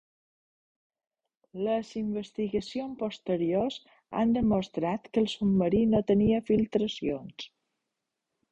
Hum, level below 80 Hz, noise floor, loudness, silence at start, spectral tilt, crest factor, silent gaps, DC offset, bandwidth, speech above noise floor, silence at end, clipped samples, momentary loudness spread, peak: none; -54 dBFS; -85 dBFS; -29 LUFS; 1.55 s; -7.5 dB/octave; 18 dB; none; under 0.1%; 8.2 kHz; 57 dB; 1.05 s; under 0.1%; 12 LU; -12 dBFS